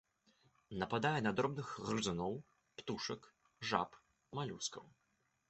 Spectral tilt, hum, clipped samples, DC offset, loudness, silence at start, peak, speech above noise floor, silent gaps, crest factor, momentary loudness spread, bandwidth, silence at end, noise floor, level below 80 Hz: -4.5 dB/octave; none; under 0.1%; under 0.1%; -41 LUFS; 0.7 s; -18 dBFS; 35 dB; none; 24 dB; 14 LU; 8.2 kHz; 0.6 s; -75 dBFS; -70 dBFS